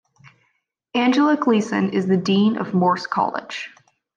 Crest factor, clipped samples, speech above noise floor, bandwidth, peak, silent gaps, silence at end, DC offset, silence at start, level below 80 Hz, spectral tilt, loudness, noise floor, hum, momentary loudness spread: 14 dB; under 0.1%; 51 dB; 9 kHz; -6 dBFS; none; 0.5 s; under 0.1%; 0.95 s; -70 dBFS; -6.5 dB/octave; -19 LUFS; -70 dBFS; none; 12 LU